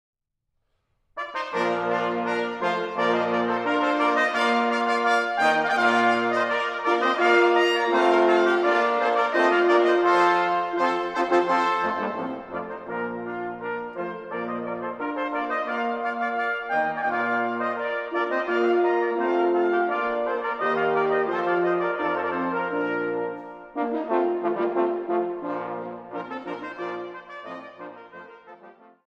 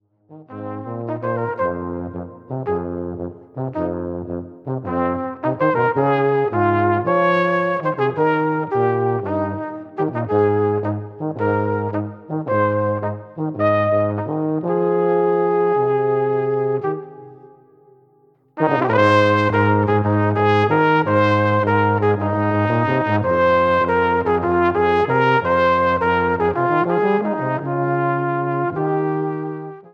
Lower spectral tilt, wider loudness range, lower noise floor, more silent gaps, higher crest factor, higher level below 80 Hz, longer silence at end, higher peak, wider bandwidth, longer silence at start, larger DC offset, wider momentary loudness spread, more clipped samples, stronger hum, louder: second, -5 dB/octave vs -8.5 dB/octave; about the same, 9 LU vs 7 LU; first, -77 dBFS vs -56 dBFS; neither; about the same, 18 dB vs 16 dB; second, -68 dBFS vs -52 dBFS; first, 0.4 s vs 0.05 s; second, -6 dBFS vs -2 dBFS; first, 9.6 kHz vs 7.2 kHz; first, 1.15 s vs 0.3 s; neither; about the same, 14 LU vs 12 LU; neither; neither; second, -24 LUFS vs -19 LUFS